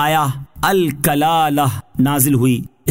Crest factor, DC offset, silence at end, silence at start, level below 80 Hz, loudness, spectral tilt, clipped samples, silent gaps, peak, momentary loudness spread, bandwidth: 16 dB; 0.6%; 0 s; 0 s; -44 dBFS; -16 LUFS; -5 dB/octave; under 0.1%; none; 0 dBFS; 6 LU; 16.5 kHz